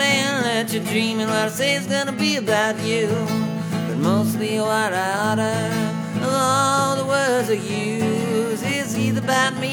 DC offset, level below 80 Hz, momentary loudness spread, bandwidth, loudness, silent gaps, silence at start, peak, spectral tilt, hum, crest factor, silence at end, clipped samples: under 0.1%; -64 dBFS; 4 LU; 20 kHz; -20 LUFS; none; 0 s; -6 dBFS; -4.5 dB/octave; none; 16 dB; 0 s; under 0.1%